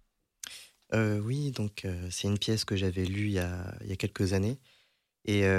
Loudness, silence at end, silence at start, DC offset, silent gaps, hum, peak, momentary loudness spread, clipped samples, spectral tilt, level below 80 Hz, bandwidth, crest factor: -32 LUFS; 0 s; 0.45 s; under 0.1%; none; none; -16 dBFS; 14 LU; under 0.1%; -5.5 dB/octave; -56 dBFS; 14.5 kHz; 16 dB